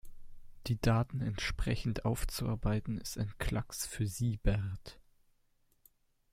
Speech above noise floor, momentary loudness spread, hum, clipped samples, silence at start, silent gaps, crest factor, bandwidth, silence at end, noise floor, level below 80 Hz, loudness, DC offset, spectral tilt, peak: 38 dB; 8 LU; none; under 0.1%; 0.05 s; none; 20 dB; 16 kHz; 1.3 s; -72 dBFS; -44 dBFS; -36 LUFS; under 0.1%; -5.5 dB/octave; -16 dBFS